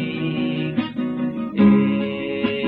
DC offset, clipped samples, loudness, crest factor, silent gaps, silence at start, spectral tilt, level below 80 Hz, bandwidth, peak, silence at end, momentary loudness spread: under 0.1%; under 0.1%; -21 LUFS; 16 dB; none; 0 s; -10 dB/octave; -56 dBFS; 4.6 kHz; -4 dBFS; 0 s; 9 LU